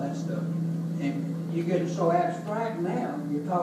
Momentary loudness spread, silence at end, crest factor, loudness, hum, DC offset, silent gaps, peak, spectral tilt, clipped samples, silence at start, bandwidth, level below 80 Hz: 6 LU; 0 s; 16 dB; -29 LUFS; none; under 0.1%; none; -12 dBFS; -8 dB/octave; under 0.1%; 0 s; 12 kHz; -74 dBFS